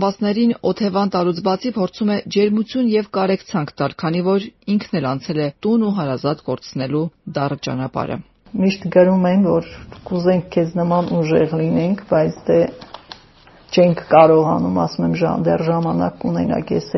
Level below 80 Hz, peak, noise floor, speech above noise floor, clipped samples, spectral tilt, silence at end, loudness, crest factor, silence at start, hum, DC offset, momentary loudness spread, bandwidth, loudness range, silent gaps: -50 dBFS; 0 dBFS; -47 dBFS; 30 dB; under 0.1%; -6.5 dB/octave; 0 s; -18 LUFS; 18 dB; 0 s; none; under 0.1%; 9 LU; 6.2 kHz; 5 LU; none